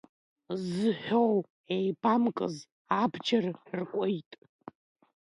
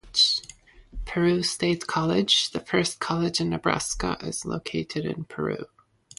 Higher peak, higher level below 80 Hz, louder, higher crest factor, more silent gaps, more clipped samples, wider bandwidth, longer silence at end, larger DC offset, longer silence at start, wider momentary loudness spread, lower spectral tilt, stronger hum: second, -12 dBFS vs -6 dBFS; second, -76 dBFS vs -46 dBFS; second, -30 LUFS vs -25 LUFS; about the same, 18 dB vs 20 dB; first, 1.50-1.64 s, 2.72-2.85 s, 4.26-4.31 s vs none; neither; about the same, 10.5 kHz vs 11.5 kHz; first, 0.85 s vs 0.55 s; neither; first, 0.5 s vs 0.05 s; about the same, 11 LU vs 11 LU; first, -6.5 dB/octave vs -3.5 dB/octave; neither